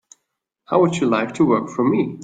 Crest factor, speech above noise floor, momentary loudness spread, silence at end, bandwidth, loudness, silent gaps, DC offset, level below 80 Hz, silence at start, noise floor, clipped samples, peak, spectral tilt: 16 dB; 59 dB; 3 LU; 0 s; 9.2 kHz; -19 LUFS; none; under 0.1%; -60 dBFS; 0.7 s; -77 dBFS; under 0.1%; -2 dBFS; -6.5 dB/octave